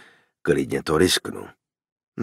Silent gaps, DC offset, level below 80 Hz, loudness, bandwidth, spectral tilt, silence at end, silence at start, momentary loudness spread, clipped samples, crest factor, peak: 1.92-1.96 s, 2.08-2.12 s; under 0.1%; -50 dBFS; -22 LUFS; 16 kHz; -4 dB/octave; 0 s; 0.45 s; 18 LU; under 0.1%; 20 dB; -6 dBFS